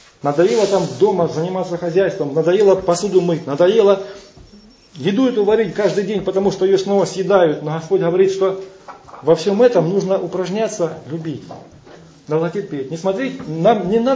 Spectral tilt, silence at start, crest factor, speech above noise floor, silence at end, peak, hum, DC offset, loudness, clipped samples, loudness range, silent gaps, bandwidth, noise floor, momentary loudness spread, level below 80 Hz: -6 dB/octave; 0.25 s; 16 dB; 29 dB; 0 s; -2 dBFS; none; under 0.1%; -17 LUFS; under 0.1%; 5 LU; none; 8 kHz; -45 dBFS; 10 LU; -54 dBFS